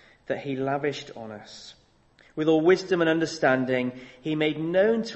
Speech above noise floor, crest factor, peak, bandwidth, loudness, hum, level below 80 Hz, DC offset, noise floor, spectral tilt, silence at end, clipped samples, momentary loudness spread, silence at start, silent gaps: 34 dB; 18 dB; -8 dBFS; 8.4 kHz; -25 LUFS; none; -64 dBFS; under 0.1%; -59 dBFS; -5.5 dB/octave; 0 s; under 0.1%; 18 LU; 0.3 s; none